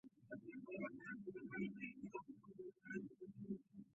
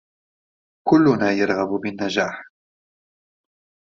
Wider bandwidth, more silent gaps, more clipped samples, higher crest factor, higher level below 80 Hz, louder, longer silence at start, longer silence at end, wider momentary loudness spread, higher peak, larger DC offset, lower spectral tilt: about the same, 7.4 kHz vs 7.4 kHz; neither; neither; about the same, 18 dB vs 20 dB; second, -84 dBFS vs -62 dBFS; second, -52 LUFS vs -20 LUFS; second, 0.05 s vs 0.85 s; second, 0.05 s vs 1.4 s; second, 9 LU vs 12 LU; second, -34 dBFS vs -4 dBFS; neither; first, -6.5 dB/octave vs -4.5 dB/octave